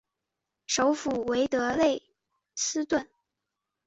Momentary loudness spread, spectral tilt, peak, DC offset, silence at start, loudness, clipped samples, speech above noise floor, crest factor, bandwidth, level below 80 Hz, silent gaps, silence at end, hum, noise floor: 9 LU; -2.5 dB/octave; -12 dBFS; under 0.1%; 0.7 s; -28 LUFS; under 0.1%; 59 dB; 18 dB; 8.4 kHz; -62 dBFS; none; 0.8 s; none; -86 dBFS